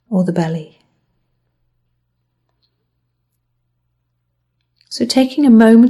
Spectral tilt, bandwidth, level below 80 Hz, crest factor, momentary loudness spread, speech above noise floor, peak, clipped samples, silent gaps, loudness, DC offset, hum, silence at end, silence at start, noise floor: -6.5 dB/octave; 12 kHz; -60 dBFS; 16 dB; 16 LU; 58 dB; 0 dBFS; under 0.1%; none; -14 LUFS; under 0.1%; none; 0 s; 0.1 s; -69 dBFS